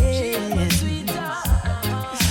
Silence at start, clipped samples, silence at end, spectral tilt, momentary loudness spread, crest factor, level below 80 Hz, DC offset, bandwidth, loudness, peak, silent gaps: 0 s; under 0.1%; 0 s; -4.5 dB/octave; 5 LU; 12 dB; -26 dBFS; under 0.1%; 19 kHz; -23 LUFS; -8 dBFS; none